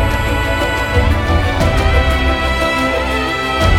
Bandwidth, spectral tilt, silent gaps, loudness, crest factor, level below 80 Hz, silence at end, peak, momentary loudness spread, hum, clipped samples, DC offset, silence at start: 16.5 kHz; -5.5 dB/octave; none; -15 LUFS; 14 dB; -20 dBFS; 0 s; 0 dBFS; 3 LU; none; under 0.1%; under 0.1%; 0 s